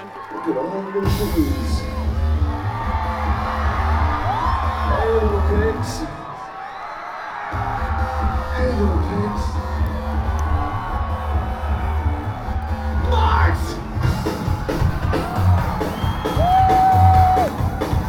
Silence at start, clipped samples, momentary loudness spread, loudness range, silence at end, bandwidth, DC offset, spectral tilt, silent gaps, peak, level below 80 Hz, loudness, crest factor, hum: 0 s; under 0.1%; 10 LU; 6 LU; 0 s; 16.5 kHz; under 0.1%; -7 dB/octave; none; -2 dBFS; -24 dBFS; -21 LUFS; 18 dB; none